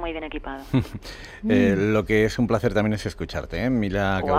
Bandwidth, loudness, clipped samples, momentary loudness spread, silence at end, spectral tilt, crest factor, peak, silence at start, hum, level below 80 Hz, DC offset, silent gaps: 15.5 kHz; -23 LUFS; under 0.1%; 13 LU; 0 s; -7 dB/octave; 18 dB; -6 dBFS; 0 s; none; -40 dBFS; under 0.1%; none